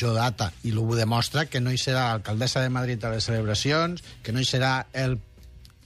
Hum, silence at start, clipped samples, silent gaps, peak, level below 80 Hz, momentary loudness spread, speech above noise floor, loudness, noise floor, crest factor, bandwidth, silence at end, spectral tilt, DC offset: none; 0 s; under 0.1%; none; -12 dBFS; -48 dBFS; 5 LU; 23 dB; -25 LUFS; -48 dBFS; 14 dB; 13.5 kHz; 0.2 s; -5 dB/octave; under 0.1%